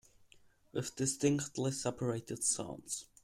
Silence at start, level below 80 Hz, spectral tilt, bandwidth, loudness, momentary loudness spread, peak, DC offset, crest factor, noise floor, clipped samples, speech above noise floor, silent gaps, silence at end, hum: 0.75 s; -68 dBFS; -4.5 dB/octave; 16 kHz; -36 LUFS; 9 LU; -18 dBFS; under 0.1%; 20 dB; -65 dBFS; under 0.1%; 28 dB; none; 0.2 s; none